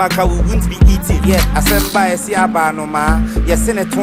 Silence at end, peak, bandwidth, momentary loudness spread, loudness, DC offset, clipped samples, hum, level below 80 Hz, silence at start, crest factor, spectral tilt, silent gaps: 0 s; 0 dBFS; 16.5 kHz; 4 LU; -14 LUFS; under 0.1%; under 0.1%; none; -16 dBFS; 0 s; 12 dB; -5 dB/octave; none